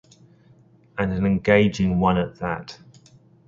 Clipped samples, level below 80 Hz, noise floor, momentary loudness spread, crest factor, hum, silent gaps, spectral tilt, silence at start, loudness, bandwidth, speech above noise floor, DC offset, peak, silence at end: under 0.1%; -44 dBFS; -54 dBFS; 14 LU; 22 dB; none; none; -7.5 dB/octave; 0.95 s; -22 LUFS; 7.4 kHz; 33 dB; under 0.1%; -2 dBFS; 0.7 s